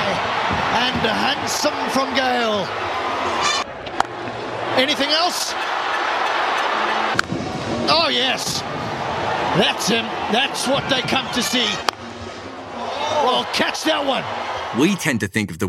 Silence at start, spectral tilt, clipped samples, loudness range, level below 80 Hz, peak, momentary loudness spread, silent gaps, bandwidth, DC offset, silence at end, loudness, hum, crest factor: 0 s; -3 dB/octave; under 0.1%; 2 LU; -50 dBFS; 0 dBFS; 8 LU; none; 16 kHz; under 0.1%; 0 s; -20 LUFS; none; 20 dB